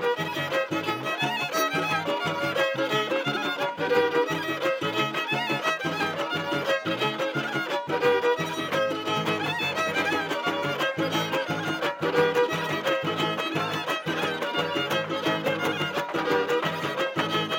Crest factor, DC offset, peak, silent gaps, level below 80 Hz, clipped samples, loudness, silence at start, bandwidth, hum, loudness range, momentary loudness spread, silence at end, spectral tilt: 18 dB; under 0.1%; -10 dBFS; none; -72 dBFS; under 0.1%; -26 LUFS; 0 s; 17 kHz; none; 1 LU; 4 LU; 0 s; -4 dB/octave